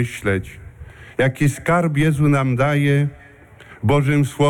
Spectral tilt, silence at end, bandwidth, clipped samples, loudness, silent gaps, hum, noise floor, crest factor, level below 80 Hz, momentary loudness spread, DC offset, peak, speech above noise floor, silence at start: -7 dB/octave; 0 s; 13.5 kHz; under 0.1%; -18 LUFS; none; none; -44 dBFS; 12 dB; -44 dBFS; 9 LU; under 0.1%; -8 dBFS; 27 dB; 0 s